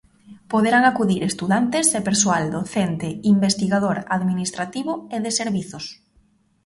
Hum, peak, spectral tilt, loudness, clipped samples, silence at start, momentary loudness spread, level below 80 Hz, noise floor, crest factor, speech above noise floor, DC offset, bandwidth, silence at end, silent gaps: none; -2 dBFS; -4 dB/octave; -20 LUFS; under 0.1%; 0.3 s; 10 LU; -56 dBFS; -60 dBFS; 18 dB; 39 dB; under 0.1%; 11.5 kHz; 0.75 s; none